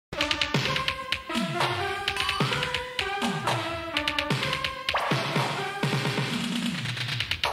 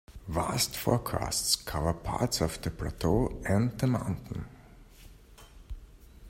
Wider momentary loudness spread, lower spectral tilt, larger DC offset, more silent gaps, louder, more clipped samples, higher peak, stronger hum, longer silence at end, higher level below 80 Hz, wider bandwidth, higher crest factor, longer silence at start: second, 4 LU vs 15 LU; about the same, -4 dB/octave vs -4.5 dB/octave; neither; neither; first, -27 LUFS vs -30 LUFS; neither; about the same, -10 dBFS vs -10 dBFS; neither; about the same, 0 s vs 0 s; second, -52 dBFS vs -44 dBFS; about the same, 16 kHz vs 16 kHz; about the same, 18 dB vs 22 dB; about the same, 0.1 s vs 0.1 s